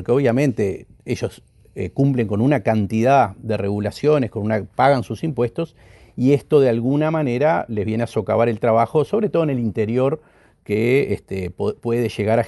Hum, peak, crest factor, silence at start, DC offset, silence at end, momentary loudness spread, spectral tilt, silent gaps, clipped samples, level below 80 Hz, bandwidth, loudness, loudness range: none; -2 dBFS; 16 dB; 0 s; under 0.1%; 0 s; 10 LU; -8 dB/octave; none; under 0.1%; -52 dBFS; 11.5 kHz; -20 LUFS; 2 LU